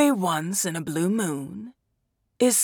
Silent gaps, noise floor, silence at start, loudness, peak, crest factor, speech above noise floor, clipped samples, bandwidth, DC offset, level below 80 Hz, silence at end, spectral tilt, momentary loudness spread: none; -74 dBFS; 0 s; -25 LUFS; -8 dBFS; 16 dB; 48 dB; under 0.1%; over 20 kHz; under 0.1%; -70 dBFS; 0 s; -4 dB/octave; 17 LU